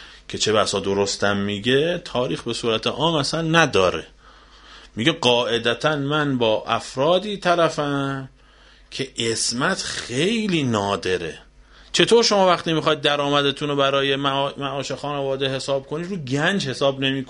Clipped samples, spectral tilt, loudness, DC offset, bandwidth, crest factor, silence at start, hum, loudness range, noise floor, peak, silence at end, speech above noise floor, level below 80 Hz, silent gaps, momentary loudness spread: under 0.1%; -4 dB/octave; -21 LUFS; under 0.1%; 11 kHz; 20 dB; 0 s; none; 4 LU; -50 dBFS; 0 dBFS; 0 s; 29 dB; -52 dBFS; none; 9 LU